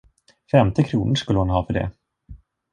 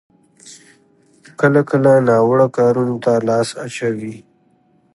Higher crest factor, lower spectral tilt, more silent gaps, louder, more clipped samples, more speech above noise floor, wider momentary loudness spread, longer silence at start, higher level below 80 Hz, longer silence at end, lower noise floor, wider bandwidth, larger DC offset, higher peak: about the same, 20 dB vs 16 dB; about the same, -7 dB/octave vs -7 dB/octave; neither; second, -21 LUFS vs -15 LUFS; neither; second, 26 dB vs 42 dB; second, 8 LU vs 11 LU; about the same, 0.55 s vs 0.45 s; first, -38 dBFS vs -62 dBFS; second, 0.35 s vs 0.75 s; second, -45 dBFS vs -57 dBFS; second, 9.8 kHz vs 11.5 kHz; neither; about the same, -2 dBFS vs 0 dBFS